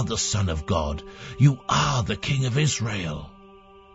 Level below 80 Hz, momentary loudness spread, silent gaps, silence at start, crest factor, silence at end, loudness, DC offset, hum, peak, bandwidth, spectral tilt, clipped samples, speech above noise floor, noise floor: -40 dBFS; 12 LU; none; 0 s; 18 dB; 0.35 s; -24 LUFS; under 0.1%; none; -6 dBFS; 8 kHz; -4.5 dB/octave; under 0.1%; 25 dB; -49 dBFS